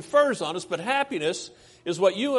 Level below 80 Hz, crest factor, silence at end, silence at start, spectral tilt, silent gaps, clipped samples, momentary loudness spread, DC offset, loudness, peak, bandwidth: -70 dBFS; 18 dB; 0 s; 0 s; -4 dB/octave; none; under 0.1%; 13 LU; under 0.1%; -26 LUFS; -8 dBFS; 11.5 kHz